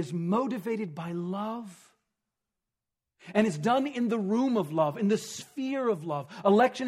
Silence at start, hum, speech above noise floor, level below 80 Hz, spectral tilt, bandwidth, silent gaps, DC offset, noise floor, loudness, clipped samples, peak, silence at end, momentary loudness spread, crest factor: 0 s; none; 60 dB; -76 dBFS; -6 dB/octave; 14.5 kHz; none; under 0.1%; -88 dBFS; -29 LUFS; under 0.1%; -8 dBFS; 0 s; 10 LU; 20 dB